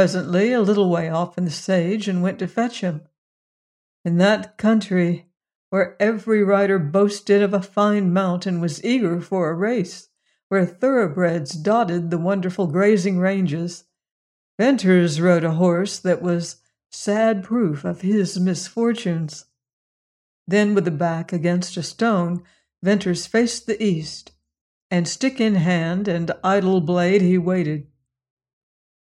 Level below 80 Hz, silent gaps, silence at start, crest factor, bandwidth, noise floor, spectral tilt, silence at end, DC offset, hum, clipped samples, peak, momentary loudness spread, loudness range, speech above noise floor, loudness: -64 dBFS; 3.18-4.04 s, 5.55-5.72 s, 10.43-10.50 s, 14.11-14.58 s, 19.73-20.46 s, 24.61-24.90 s; 0 s; 16 dB; 11 kHz; under -90 dBFS; -6.5 dB/octave; 1.35 s; under 0.1%; none; under 0.1%; -4 dBFS; 8 LU; 4 LU; over 71 dB; -20 LUFS